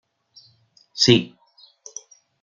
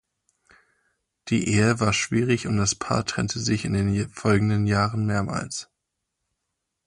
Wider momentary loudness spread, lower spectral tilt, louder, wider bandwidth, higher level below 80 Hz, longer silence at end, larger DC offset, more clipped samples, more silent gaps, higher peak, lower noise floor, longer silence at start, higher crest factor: first, 23 LU vs 7 LU; about the same, -4 dB/octave vs -5 dB/octave; first, -17 LUFS vs -24 LUFS; second, 7.6 kHz vs 11 kHz; second, -62 dBFS vs -46 dBFS; about the same, 1.15 s vs 1.25 s; neither; neither; neither; first, -2 dBFS vs -8 dBFS; second, -58 dBFS vs -81 dBFS; second, 0.95 s vs 1.25 s; first, 24 dB vs 18 dB